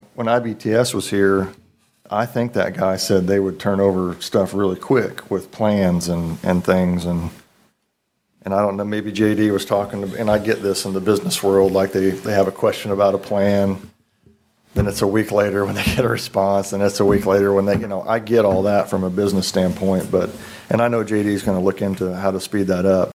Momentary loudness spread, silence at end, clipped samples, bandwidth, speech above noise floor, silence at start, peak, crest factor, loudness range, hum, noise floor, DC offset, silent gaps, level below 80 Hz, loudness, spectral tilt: 6 LU; 0 s; under 0.1%; 16 kHz; 53 dB; 0.2 s; -2 dBFS; 16 dB; 3 LU; none; -71 dBFS; under 0.1%; none; -44 dBFS; -19 LUFS; -6 dB/octave